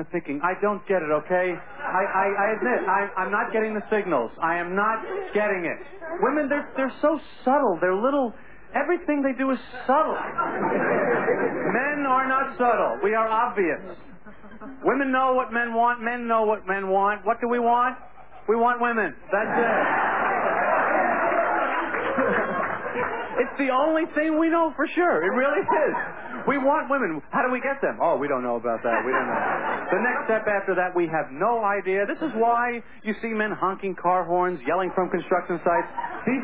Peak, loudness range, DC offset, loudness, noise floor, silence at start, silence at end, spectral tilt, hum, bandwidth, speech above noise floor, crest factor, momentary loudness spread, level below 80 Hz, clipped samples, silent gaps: -10 dBFS; 2 LU; 0.7%; -24 LUFS; -46 dBFS; 0 s; 0 s; -9.5 dB/octave; none; 4 kHz; 22 dB; 14 dB; 6 LU; -60 dBFS; under 0.1%; none